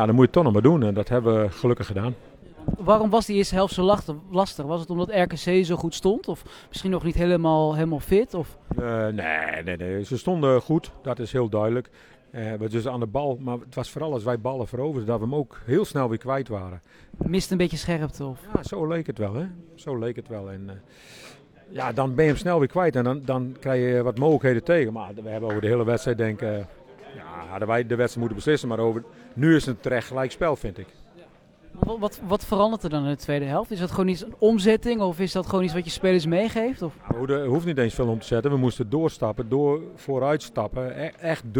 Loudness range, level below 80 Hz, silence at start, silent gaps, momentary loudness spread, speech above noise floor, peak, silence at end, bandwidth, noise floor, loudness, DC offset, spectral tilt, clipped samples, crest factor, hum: 5 LU; -44 dBFS; 0 s; none; 12 LU; 28 dB; -2 dBFS; 0 s; 19 kHz; -51 dBFS; -24 LUFS; under 0.1%; -7 dB/octave; under 0.1%; 22 dB; none